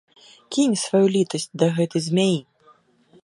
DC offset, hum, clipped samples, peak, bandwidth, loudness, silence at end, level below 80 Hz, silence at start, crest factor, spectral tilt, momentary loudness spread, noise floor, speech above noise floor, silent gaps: under 0.1%; none; under 0.1%; -4 dBFS; 11.5 kHz; -21 LUFS; 0.85 s; -70 dBFS; 0.5 s; 18 dB; -5.5 dB/octave; 6 LU; -57 dBFS; 36 dB; none